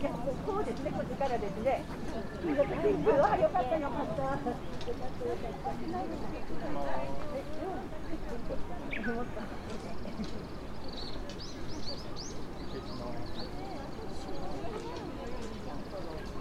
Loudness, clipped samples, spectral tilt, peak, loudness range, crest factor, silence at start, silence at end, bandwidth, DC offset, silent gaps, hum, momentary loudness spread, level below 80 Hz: -36 LUFS; under 0.1%; -6 dB/octave; -14 dBFS; 10 LU; 20 dB; 0 s; 0 s; 13.5 kHz; under 0.1%; none; none; 12 LU; -46 dBFS